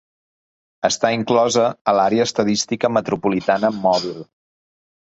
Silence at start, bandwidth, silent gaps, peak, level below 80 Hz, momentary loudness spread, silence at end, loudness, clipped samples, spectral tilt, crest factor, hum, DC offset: 0.85 s; 8.2 kHz; 1.81-1.85 s; -2 dBFS; -58 dBFS; 5 LU; 0.85 s; -18 LUFS; under 0.1%; -4 dB/octave; 18 dB; none; under 0.1%